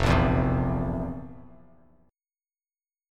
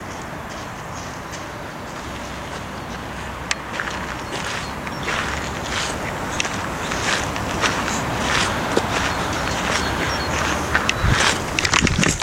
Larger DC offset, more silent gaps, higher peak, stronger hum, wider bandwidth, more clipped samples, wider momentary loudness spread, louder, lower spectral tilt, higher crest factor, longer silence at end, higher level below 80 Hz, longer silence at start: neither; neither; second, -8 dBFS vs 0 dBFS; neither; second, 11 kHz vs 17 kHz; neither; first, 17 LU vs 13 LU; second, -26 LUFS vs -22 LUFS; first, -7.5 dB/octave vs -3 dB/octave; about the same, 20 dB vs 24 dB; first, 1.65 s vs 0 s; about the same, -36 dBFS vs -36 dBFS; about the same, 0 s vs 0 s